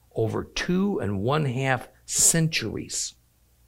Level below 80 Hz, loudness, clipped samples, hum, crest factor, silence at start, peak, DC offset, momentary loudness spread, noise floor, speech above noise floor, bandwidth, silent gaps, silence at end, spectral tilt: -50 dBFS; -24 LUFS; under 0.1%; none; 20 dB; 0.15 s; -6 dBFS; under 0.1%; 11 LU; -61 dBFS; 36 dB; 16 kHz; none; 0.55 s; -3.5 dB/octave